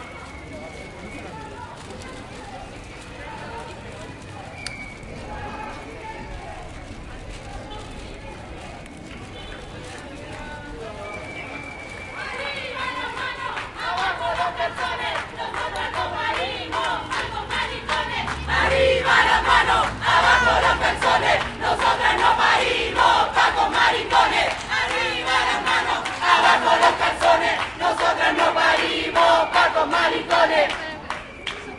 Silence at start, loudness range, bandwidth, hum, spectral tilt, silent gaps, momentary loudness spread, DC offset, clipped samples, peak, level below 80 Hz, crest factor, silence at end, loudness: 0 s; 18 LU; 11.5 kHz; none; -3 dB/octave; none; 20 LU; under 0.1%; under 0.1%; -2 dBFS; -42 dBFS; 20 dB; 0 s; -20 LUFS